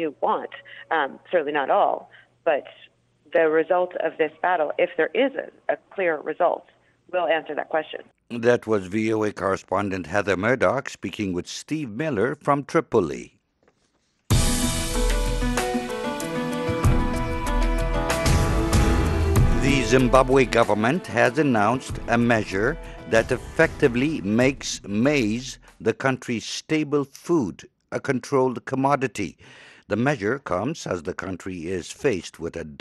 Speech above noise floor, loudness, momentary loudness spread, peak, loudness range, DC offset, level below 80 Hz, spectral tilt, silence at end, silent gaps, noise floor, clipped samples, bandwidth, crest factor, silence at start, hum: 45 dB; -23 LUFS; 10 LU; -2 dBFS; 6 LU; under 0.1%; -32 dBFS; -5.5 dB/octave; 0.05 s; none; -68 dBFS; under 0.1%; 12.5 kHz; 22 dB; 0 s; none